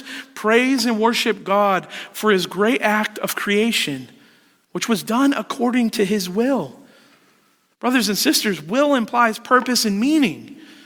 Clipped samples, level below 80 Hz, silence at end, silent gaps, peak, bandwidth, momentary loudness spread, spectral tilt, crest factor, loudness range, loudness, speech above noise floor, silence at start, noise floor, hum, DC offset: under 0.1%; -66 dBFS; 0.15 s; none; -2 dBFS; over 20 kHz; 8 LU; -3.5 dB/octave; 18 dB; 3 LU; -19 LUFS; 41 dB; 0 s; -60 dBFS; none; under 0.1%